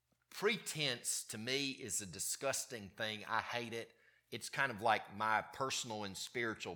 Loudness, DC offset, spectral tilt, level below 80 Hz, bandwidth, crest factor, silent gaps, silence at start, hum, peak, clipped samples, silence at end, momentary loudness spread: -39 LUFS; under 0.1%; -2 dB/octave; -80 dBFS; 19 kHz; 22 dB; none; 0.3 s; none; -18 dBFS; under 0.1%; 0 s; 9 LU